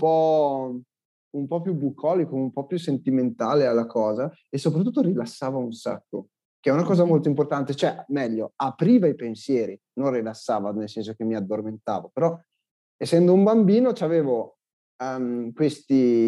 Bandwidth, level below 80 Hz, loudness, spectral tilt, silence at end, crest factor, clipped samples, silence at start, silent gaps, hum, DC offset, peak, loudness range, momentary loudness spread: 12 kHz; -84 dBFS; -24 LUFS; -8 dB/octave; 0 s; 16 dB; under 0.1%; 0 s; 1.05-1.31 s, 6.45-6.63 s, 12.71-12.99 s, 14.73-14.99 s; none; under 0.1%; -8 dBFS; 5 LU; 12 LU